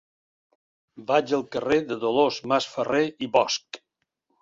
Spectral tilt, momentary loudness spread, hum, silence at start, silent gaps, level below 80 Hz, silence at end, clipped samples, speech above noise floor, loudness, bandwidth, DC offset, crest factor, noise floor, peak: -4 dB/octave; 7 LU; none; 0.95 s; none; -64 dBFS; 0.65 s; under 0.1%; 53 dB; -24 LUFS; 7.8 kHz; under 0.1%; 22 dB; -77 dBFS; -4 dBFS